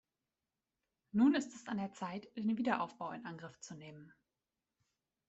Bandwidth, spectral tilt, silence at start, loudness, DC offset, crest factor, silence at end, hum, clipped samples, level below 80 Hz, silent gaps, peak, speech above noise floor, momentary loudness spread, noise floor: 8.2 kHz; -5.5 dB/octave; 1.15 s; -37 LUFS; under 0.1%; 20 dB; 1.2 s; none; under 0.1%; -80 dBFS; none; -20 dBFS; over 53 dB; 19 LU; under -90 dBFS